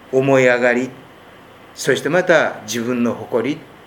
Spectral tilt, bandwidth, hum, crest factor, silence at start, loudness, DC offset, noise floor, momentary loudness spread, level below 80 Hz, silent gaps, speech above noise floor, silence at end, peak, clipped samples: -5 dB/octave; 18 kHz; none; 18 dB; 0.1 s; -17 LUFS; under 0.1%; -43 dBFS; 10 LU; -62 dBFS; none; 26 dB; 0.2 s; 0 dBFS; under 0.1%